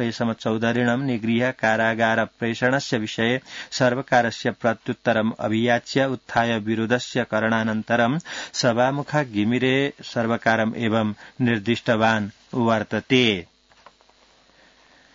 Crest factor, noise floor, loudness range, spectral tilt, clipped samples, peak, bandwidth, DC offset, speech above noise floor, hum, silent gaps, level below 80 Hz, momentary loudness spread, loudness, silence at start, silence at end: 18 dB; -57 dBFS; 1 LU; -5.5 dB/octave; under 0.1%; -4 dBFS; 7.8 kHz; under 0.1%; 35 dB; none; none; -62 dBFS; 5 LU; -22 LUFS; 0 s; 1.7 s